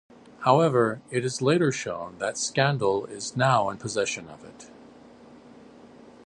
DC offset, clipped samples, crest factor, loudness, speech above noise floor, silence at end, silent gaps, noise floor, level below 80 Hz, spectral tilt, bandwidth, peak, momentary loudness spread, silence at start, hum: under 0.1%; under 0.1%; 22 dB; -25 LUFS; 25 dB; 0.15 s; none; -50 dBFS; -64 dBFS; -5 dB/octave; 11.5 kHz; -6 dBFS; 12 LU; 0.4 s; none